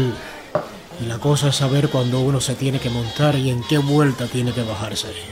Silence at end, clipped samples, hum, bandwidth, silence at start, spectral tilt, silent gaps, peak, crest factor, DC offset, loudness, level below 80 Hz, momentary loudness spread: 0 s; under 0.1%; none; 16 kHz; 0 s; -5.5 dB/octave; none; -6 dBFS; 14 dB; under 0.1%; -20 LUFS; -46 dBFS; 9 LU